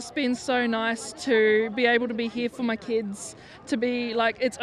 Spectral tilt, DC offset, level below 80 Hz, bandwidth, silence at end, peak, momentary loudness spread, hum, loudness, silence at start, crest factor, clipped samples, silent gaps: -3.5 dB/octave; under 0.1%; -64 dBFS; 12.5 kHz; 0 s; -10 dBFS; 9 LU; none; -25 LUFS; 0 s; 16 dB; under 0.1%; none